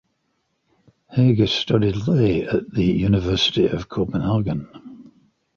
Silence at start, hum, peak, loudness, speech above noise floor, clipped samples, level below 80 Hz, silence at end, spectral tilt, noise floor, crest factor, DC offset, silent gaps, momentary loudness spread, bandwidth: 1.1 s; none; -4 dBFS; -20 LUFS; 52 dB; under 0.1%; -42 dBFS; 0.55 s; -7 dB/octave; -71 dBFS; 16 dB; under 0.1%; none; 7 LU; 7.2 kHz